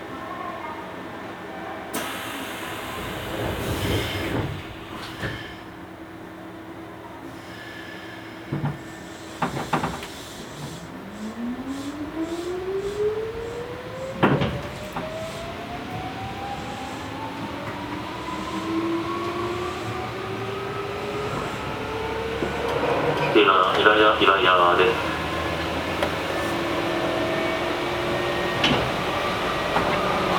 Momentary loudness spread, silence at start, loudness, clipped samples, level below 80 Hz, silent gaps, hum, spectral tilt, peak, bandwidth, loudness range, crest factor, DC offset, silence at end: 18 LU; 0 s; -25 LUFS; under 0.1%; -46 dBFS; none; none; -5 dB/octave; -2 dBFS; over 20 kHz; 13 LU; 24 dB; under 0.1%; 0 s